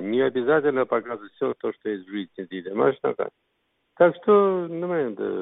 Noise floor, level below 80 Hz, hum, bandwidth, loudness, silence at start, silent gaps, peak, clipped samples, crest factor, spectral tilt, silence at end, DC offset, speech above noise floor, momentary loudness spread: -63 dBFS; -72 dBFS; none; 4 kHz; -24 LUFS; 0 s; none; -6 dBFS; under 0.1%; 18 dB; -10.5 dB/octave; 0 s; under 0.1%; 40 dB; 14 LU